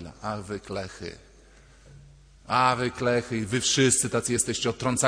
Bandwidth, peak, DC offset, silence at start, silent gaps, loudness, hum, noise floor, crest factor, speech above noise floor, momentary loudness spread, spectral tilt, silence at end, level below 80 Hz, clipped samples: 11 kHz; -6 dBFS; under 0.1%; 0 s; none; -25 LUFS; none; -53 dBFS; 20 dB; 27 dB; 14 LU; -3.5 dB/octave; 0 s; -54 dBFS; under 0.1%